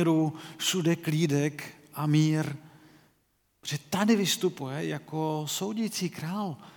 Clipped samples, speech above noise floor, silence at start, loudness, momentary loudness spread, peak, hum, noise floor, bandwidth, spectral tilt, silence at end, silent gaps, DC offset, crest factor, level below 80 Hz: under 0.1%; 43 dB; 0 s; -29 LUFS; 11 LU; -10 dBFS; none; -72 dBFS; 19 kHz; -5 dB/octave; 0.05 s; none; under 0.1%; 18 dB; -74 dBFS